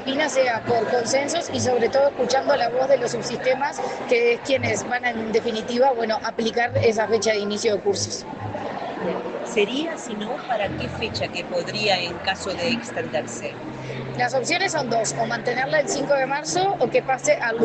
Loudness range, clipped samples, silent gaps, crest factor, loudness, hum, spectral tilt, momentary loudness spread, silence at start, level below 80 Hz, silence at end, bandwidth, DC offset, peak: 4 LU; under 0.1%; none; 16 dB; -23 LUFS; none; -3.5 dB/octave; 9 LU; 0 s; -56 dBFS; 0 s; 9.2 kHz; under 0.1%; -6 dBFS